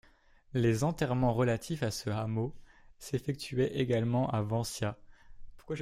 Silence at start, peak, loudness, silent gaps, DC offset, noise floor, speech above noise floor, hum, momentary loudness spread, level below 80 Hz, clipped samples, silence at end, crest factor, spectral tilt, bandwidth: 0.55 s; -14 dBFS; -32 LUFS; none; under 0.1%; -61 dBFS; 30 dB; none; 9 LU; -54 dBFS; under 0.1%; 0 s; 18 dB; -6.5 dB/octave; 15.5 kHz